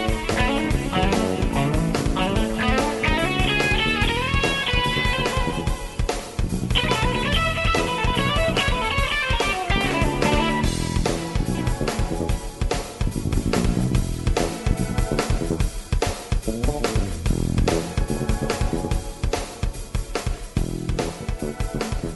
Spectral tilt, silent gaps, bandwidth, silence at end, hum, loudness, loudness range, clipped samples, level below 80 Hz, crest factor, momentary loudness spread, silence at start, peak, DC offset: -5 dB/octave; none; 12 kHz; 0 s; none; -23 LUFS; 5 LU; under 0.1%; -28 dBFS; 16 dB; 7 LU; 0 s; -6 dBFS; under 0.1%